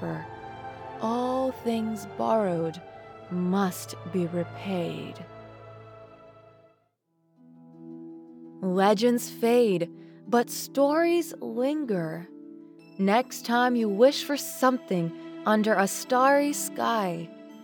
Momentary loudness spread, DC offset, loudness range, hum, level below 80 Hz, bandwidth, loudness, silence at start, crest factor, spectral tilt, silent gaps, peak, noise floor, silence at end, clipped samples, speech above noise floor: 23 LU; under 0.1%; 11 LU; none; -70 dBFS; over 20 kHz; -26 LUFS; 0 s; 20 dB; -5 dB/octave; none; -8 dBFS; -71 dBFS; 0 s; under 0.1%; 45 dB